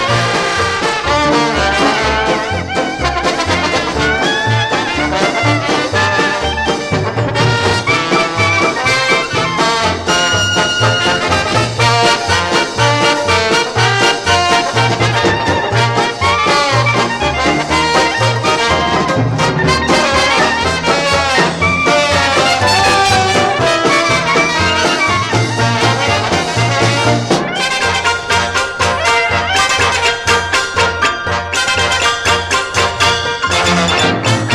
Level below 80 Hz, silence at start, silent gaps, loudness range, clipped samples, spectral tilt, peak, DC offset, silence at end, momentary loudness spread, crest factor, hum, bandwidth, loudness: -34 dBFS; 0 s; none; 3 LU; under 0.1%; -3.5 dB/octave; 0 dBFS; under 0.1%; 0 s; 4 LU; 12 dB; none; 14 kHz; -12 LUFS